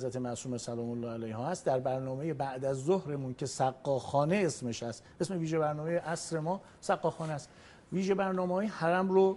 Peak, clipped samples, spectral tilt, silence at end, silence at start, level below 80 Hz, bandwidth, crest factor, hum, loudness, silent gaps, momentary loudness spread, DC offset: -14 dBFS; under 0.1%; -6 dB/octave; 0 s; 0 s; -68 dBFS; 11.5 kHz; 18 dB; none; -33 LUFS; none; 8 LU; under 0.1%